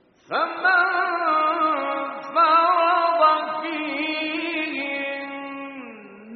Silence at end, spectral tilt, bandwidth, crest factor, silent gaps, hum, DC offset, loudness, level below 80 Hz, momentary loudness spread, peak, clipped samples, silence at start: 0 s; 1 dB/octave; 4.9 kHz; 18 dB; none; none; under 0.1%; -21 LUFS; -78 dBFS; 15 LU; -6 dBFS; under 0.1%; 0.3 s